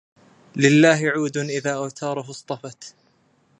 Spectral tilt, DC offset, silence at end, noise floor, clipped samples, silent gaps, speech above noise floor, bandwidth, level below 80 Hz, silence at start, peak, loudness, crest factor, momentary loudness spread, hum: -5 dB/octave; under 0.1%; 0.7 s; -62 dBFS; under 0.1%; none; 41 dB; 10.5 kHz; -72 dBFS; 0.55 s; -2 dBFS; -20 LUFS; 22 dB; 21 LU; none